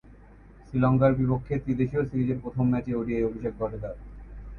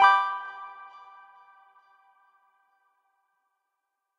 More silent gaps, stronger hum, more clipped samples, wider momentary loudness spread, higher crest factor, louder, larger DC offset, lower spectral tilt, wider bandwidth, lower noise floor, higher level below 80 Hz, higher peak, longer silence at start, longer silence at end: neither; neither; neither; second, 16 LU vs 28 LU; second, 18 dB vs 24 dB; about the same, -27 LUFS vs -26 LUFS; neither; first, -11 dB/octave vs 0 dB/octave; second, 4.3 kHz vs 10 kHz; second, -50 dBFS vs -82 dBFS; first, -44 dBFS vs -84 dBFS; about the same, -8 dBFS vs -6 dBFS; about the same, 0.05 s vs 0 s; second, 0 s vs 3.35 s